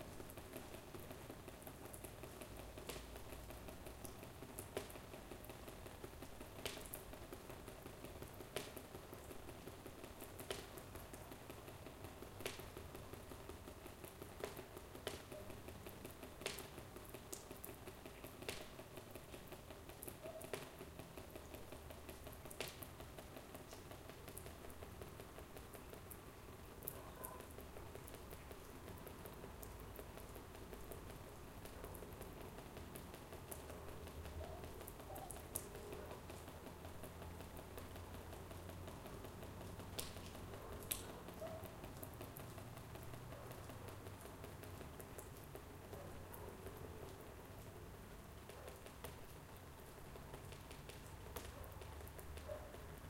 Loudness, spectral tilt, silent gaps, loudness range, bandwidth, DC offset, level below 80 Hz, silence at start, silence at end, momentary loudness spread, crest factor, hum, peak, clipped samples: -54 LUFS; -4 dB/octave; none; 4 LU; 17 kHz; under 0.1%; -62 dBFS; 0 s; 0 s; 6 LU; 34 dB; none; -18 dBFS; under 0.1%